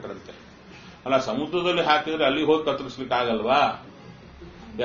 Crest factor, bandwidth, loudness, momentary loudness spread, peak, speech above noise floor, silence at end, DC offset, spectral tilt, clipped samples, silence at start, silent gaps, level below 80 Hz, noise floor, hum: 20 dB; 7 kHz; -23 LUFS; 24 LU; -6 dBFS; 23 dB; 0 s; under 0.1%; -2.5 dB/octave; under 0.1%; 0 s; none; -56 dBFS; -46 dBFS; none